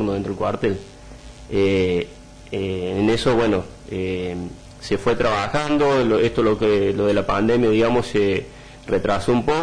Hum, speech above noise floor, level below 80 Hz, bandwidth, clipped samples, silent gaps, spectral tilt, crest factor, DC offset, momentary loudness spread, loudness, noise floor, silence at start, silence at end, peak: none; 20 dB; -42 dBFS; 10.5 kHz; under 0.1%; none; -6.5 dB/octave; 10 dB; under 0.1%; 13 LU; -20 LUFS; -40 dBFS; 0 s; 0 s; -10 dBFS